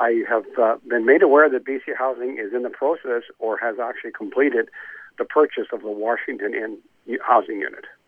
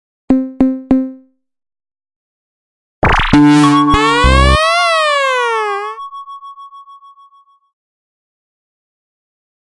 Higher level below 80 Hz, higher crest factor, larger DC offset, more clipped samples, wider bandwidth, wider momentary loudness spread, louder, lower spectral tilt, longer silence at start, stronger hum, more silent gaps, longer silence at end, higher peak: second, -76 dBFS vs -24 dBFS; about the same, 18 dB vs 14 dB; neither; neither; second, 3.6 kHz vs 11.5 kHz; second, 15 LU vs 19 LU; second, -21 LUFS vs -11 LUFS; first, -7 dB/octave vs -5.5 dB/octave; second, 0 s vs 0.3 s; neither; second, none vs 2.16-3.02 s; second, 0.15 s vs 2.75 s; about the same, -2 dBFS vs 0 dBFS